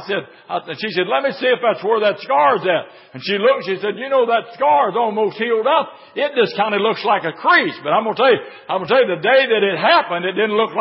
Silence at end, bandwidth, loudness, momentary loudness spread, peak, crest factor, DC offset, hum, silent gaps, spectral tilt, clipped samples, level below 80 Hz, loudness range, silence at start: 0 s; 5.8 kHz; -17 LUFS; 9 LU; -2 dBFS; 16 dB; under 0.1%; none; none; -9 dB/octave; under 0.1%; -74 dBFS; 2 LU; 0 s